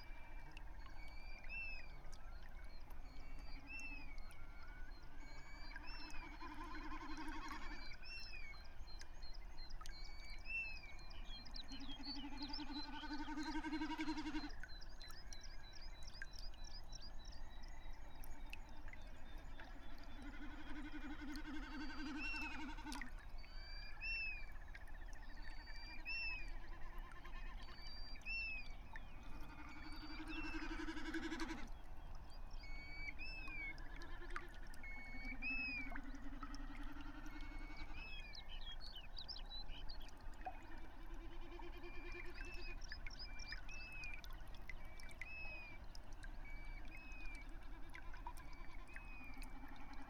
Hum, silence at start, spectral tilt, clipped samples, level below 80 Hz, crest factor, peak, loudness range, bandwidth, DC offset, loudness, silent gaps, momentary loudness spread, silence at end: none; 0 s; -4 dB/octave; under 0.1%; -52 dBFS; 18 dB; -30 dBFS; 8 LU; 14 kHz; under 0.1%; -52 LUFS; none; 13 LU; 0 s